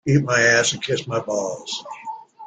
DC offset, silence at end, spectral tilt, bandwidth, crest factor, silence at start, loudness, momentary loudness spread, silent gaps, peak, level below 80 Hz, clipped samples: under 0.1%; 0 s; -4 dB/octave; 9.4 kHz; 18 dB; 0.05 s; -20 LUFS; 18 LU; none; -4 dBFS; -56 dBFS; under 0.1%